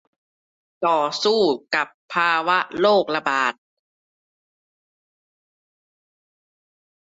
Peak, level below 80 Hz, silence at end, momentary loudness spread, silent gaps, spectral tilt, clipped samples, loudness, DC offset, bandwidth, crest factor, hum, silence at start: -6 dBFS; -70 dBFS; 3.65 s; 6 LU; 1.94-2.09 s; -3.5 dB/octave; under 0.1%; -20 LUFS; under 0.1%; 8 kHz; 18 dB; none; 0.8 s